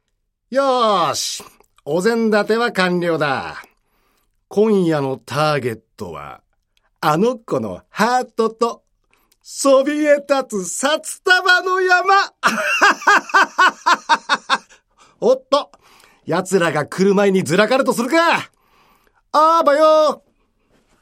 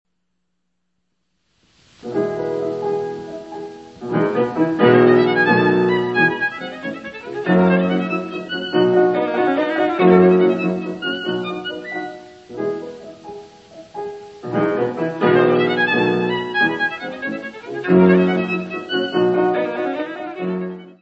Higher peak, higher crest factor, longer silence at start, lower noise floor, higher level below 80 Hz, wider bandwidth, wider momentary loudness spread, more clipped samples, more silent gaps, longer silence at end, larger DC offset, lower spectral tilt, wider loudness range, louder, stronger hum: about the same, 0 dBFS vs 0 dBFS; about the same, 16 dB vs 18 dB; second, 0.5 s vs 2.05 s; second, -70 dBFS vs -75 dBFS; about the same, -64 dBFS vs -60 dBFS; first, 16 kHz vs 7.4 kHz; second, 11 LU vs 18 LU; neither; neither; first, 0.85 s vs 0.1 s; neither; second, -4 dB/octave vs -7.5 dB/octave; second, 6 LU vs 10 LU; about the same, -16 LUFS vs -18 LUFS; neither